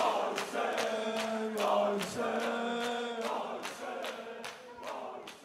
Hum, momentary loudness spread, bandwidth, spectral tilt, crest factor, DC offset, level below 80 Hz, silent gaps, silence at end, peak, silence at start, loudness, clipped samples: none; 12 LU; 16 kHz; -3.5 dB/octave; 18 dB; under 0.1%; -80 dBFS; none; 0 s; -16 dBFS; 0 s; -35 LUFS; under 0.1%